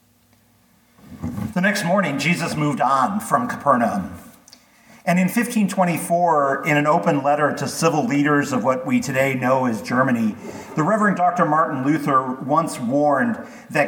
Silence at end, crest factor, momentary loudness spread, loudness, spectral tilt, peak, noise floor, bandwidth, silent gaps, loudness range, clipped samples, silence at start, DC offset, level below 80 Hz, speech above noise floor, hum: 0 s; 18 dB; 6 LU; -20 LUFS; -5.5 dB/octave; -2 dBFS; -57 dBFS; 19 kHz; none; 2 LU; under 0.1%; 1.1 s; under 0.1%; -58 dBFS; 38 dB; none